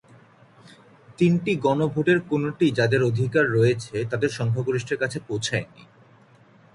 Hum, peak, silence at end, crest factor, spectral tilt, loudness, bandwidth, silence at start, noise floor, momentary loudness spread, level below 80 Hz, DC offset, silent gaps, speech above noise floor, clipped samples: none; -6 dBFS; 1.1 s; 16 dB; -6.5 dB/octave; -23 LUFS; 11.5 kHz; 1.1 s; -54 dBFS; 7 LU; -58 dBFS; under 0.1%; none; 32 dB; under 0.1%